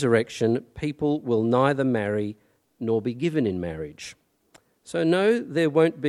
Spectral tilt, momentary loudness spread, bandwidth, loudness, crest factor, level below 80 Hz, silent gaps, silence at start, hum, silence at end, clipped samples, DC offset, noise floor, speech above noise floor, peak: -7 dB/octave; 13 LU; 12 kHz; -24 LUFS; 18 dB; -58 dBFS; none; 0 s; none; 0 s; under 0.1%; under 0.1%; -60 dBFS; 36 dB; -6 dBFS